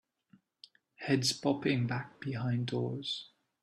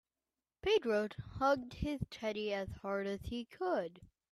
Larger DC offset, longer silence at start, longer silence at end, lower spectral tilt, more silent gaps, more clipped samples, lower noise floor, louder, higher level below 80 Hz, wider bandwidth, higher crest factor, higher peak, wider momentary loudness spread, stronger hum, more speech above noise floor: neither; first, 1 s vs 0.65 s; about the same, 0.35 s vs 0.25 s; about the same, -5 dB/octave vs -6 dB/octave; neither; neither; second, -67 dBFS vs under -90 dBFS; first, -34 LUFS vs -37 LUFS; second, -70 dBFS vs -56 dBFS; about the same, 13 kHz vs 13.5 kHz; about the same, 18 dB vs 18 dB; first, -16 dBFS vs -20 dBFS; about the same, 10 LU vs 9 LU; neither; second, 34 dB vs over 53 dB